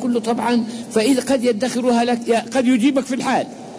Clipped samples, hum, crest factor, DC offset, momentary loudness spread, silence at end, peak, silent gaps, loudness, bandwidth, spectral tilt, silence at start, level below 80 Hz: under 0.1%; none; 12 dB; under 0.1%; 4 LU; 0 s; -6 dBFS; none; -18 LUFS; 11 kHz; -4.5 dB/octave; 0 s; -60 dBFS